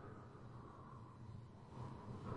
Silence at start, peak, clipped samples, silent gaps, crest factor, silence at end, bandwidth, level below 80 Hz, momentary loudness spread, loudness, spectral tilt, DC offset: 0 s; -34 dBFS; under 0.1%; none; 18 dB; 0 s; 10.5 kHz; -68 dBFS; 5 LU; -56 LUFS; -8 dB/octave; under 0.1%